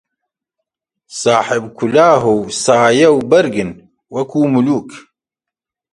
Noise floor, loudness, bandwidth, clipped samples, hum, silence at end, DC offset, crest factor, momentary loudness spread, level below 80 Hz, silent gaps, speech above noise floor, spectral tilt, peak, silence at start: -85 dBFS; -13 LUFS; 11.5 kHz; under 0.1%; none; 0.95 s; under 0.1%; 14 dB; 12 LU; -54 dBFS; none; 72 dB; -5 dB/octave; 0 dBFS; 1.1 s